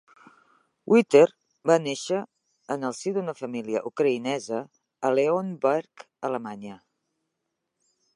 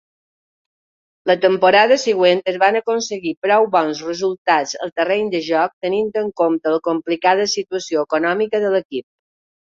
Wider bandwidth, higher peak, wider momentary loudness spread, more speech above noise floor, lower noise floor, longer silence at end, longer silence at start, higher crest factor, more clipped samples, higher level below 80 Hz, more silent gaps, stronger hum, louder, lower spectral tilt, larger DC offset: first, 11.5 kHz vs 7.8 kHz; about the same, -4 dBFS vs -2 dBFS; first, 15 LU vs 8 LU; second, 57 dB vs over 73 dB; second, -81 dBFS vs under -90 dBFS; first, 1.4 s vs 0.7 s; second, 0.85 s vs 1.25 s; first, 22 dB vs 16 dB; neither; second, -80 dBFS vs -66 dBFS; second, none vs 3.37-3.42 s, 4.38-4.45 s, 4.92-4.96 s, 5.73-5.81 s, 8.85-8.90 s; neither; second, -25 LUFS vs -17 LUFS; first, -5.5 dB/octave vs -3.5 dB/octave; neither